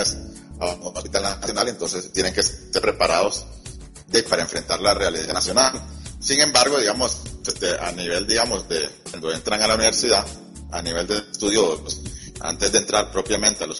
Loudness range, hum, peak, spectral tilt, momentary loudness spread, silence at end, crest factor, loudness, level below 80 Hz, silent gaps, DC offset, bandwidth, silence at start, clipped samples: 3 LU; none; -2 dBFS; -2 dB/octave; 14 LU; 0 s; 20 dB; -21 LUFS; -40 dBFS; none; under 0.1%; 11.5 kHz; 0 s; under 0.1%